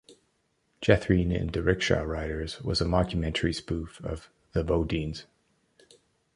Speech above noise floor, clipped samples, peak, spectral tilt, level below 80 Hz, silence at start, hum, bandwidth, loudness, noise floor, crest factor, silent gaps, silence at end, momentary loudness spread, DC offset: 45 dB; under 0.1%; -6 dBFS; -6 dB/octave; -40 dBFS; 0.1 s; none; 11 kHz; -28 LUFS; -73 dBFS; 24 dB; none; 1.15 s; 12 LU; under 0.1%